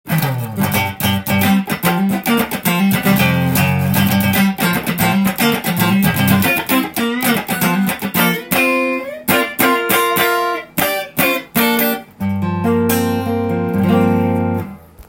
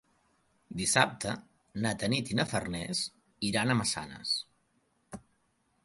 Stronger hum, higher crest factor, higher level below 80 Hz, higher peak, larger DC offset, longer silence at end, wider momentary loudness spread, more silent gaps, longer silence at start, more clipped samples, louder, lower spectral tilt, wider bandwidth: neither; second, 16 dB vs 26 dB; first, -48 dBFS vs -60 dBFS; first, 0 dBFS vs -8 dBFS; neither; second, 0.05 s vs 0.65 s; second, 5 LU vs 20 LU; neither; second, 0.05 s vs 0.7 s; neither; first, -15 LUFS vs -31 LUFS; first, -5 dB/octave vs -3.5 dB/octave; first, 17 kHz vs 12 kHz